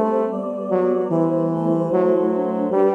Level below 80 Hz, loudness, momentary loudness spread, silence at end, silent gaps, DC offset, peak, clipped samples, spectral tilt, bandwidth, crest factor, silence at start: -68 dBFS; -20 LUFS; 4 LU; 0 s; none; under 0.1%; -6 dBFS; under 0.1%; -10 dB/octave; 3.8 kHz; 12 dB; 0 s